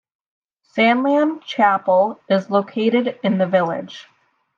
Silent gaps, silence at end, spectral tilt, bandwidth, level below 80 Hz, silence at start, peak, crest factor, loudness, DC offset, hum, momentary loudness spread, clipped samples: none; 0.55 s; -7 dB/octave; 7.2 kHz; -74 dBFS; 0.75 s; -4 dBFS; 16 dB; -18 LUFS; under 0.1%; none; 11 LU; under 0.1%